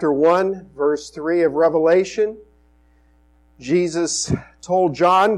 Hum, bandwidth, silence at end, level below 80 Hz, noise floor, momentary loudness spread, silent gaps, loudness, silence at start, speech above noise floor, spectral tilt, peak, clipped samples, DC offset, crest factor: 60 Hz at -50 dBFS; 11 kHz; 0 s; -50 dBFS; -55 dBFS; 9 LU; none; -19 LUFS; 0 s; 37 dB; -5 dB/octave; -6 dBFS; under 0.1%; under 0.1%; 14 dB